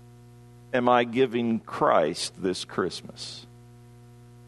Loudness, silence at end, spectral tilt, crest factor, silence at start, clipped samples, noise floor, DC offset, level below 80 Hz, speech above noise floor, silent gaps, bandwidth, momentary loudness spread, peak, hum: -26 LUFS; 0.85 s; -4.5 dB/octave; 22 dB; 0.7 s; under 0.1%; -50 dBFS; under 0.1%; -64 dBFS; 24 dB; none; 12.5 kHz; 16 LU; -6 dBFS; 60 Hz at -50 dBFS